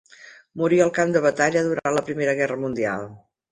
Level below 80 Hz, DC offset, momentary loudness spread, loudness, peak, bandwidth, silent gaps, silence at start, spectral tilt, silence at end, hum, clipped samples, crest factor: -62 dBFS; under 0.1%; 9 LU; -22 LUFS; -4 dBFS; 11 kHz; none; 0.2 s; -5.5 dB/octave; 0.35 s; none; under 0.1%; 18 dB